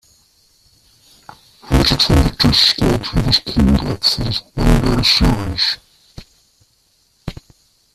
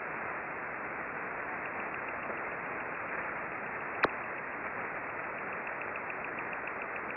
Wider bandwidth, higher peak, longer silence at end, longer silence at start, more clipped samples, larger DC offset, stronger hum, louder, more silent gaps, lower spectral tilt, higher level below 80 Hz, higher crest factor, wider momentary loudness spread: first, 14.5 kHz vs 5.6 kHz; first, 0 dBFS vs -16 dBFS; first, 0.6 s vs 0 s; first, 1.65 s vs 0 s; neither; neither; neither; first, -14 LUFS vs -37 LUFS; neither; first, -5 dB/octave vs -3 dB/octave; first, -24 dBFS vs -68 dBFS; about the same, 18 dB vs 22 dB; first, 11 LU vs 4 LU